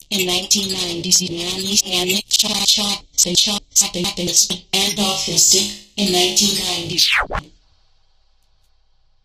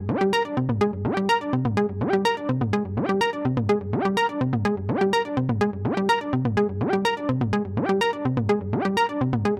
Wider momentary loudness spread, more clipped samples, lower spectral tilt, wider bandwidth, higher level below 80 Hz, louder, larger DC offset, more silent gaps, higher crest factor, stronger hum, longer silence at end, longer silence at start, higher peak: first, 7 LU vs 3 LU; neither; second, -1 dB/octave vs -7 dB/octave; first, 15.5 kHz vs 14 kHz; first, -44 dBFS vs -50 dBFS; first, -15 LUFS vs -24 LUFS; neither; neither; first, 20 dB vs 14 dB; neither; first, 1.8 s vs 0 s; about the same, 0.1 s vs 0 s; first, 0 dBFS vs -8 dBFS